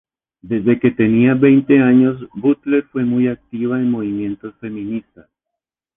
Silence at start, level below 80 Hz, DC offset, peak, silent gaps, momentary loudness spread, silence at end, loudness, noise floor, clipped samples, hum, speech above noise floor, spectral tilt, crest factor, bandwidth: 0.45 s; -54 dBFS; under 0.1%; -2 dBFS; none; 15 LU; 0.95 s; -16 LUFS; -82 dBFS; under 0.1%; none; 67 dB; -11 dB/octave; 14 dB; 3.8 kHz